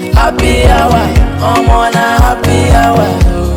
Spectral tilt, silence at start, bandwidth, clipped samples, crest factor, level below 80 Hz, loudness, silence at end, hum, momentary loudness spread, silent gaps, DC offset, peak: -6 dB/octave; 0 s; 17 kHz; under 0.1%; 8 dB; -12 dBFS; -9 LUFS; 0 s; none; 3 LU; none; under 0.1%; 0 dBFS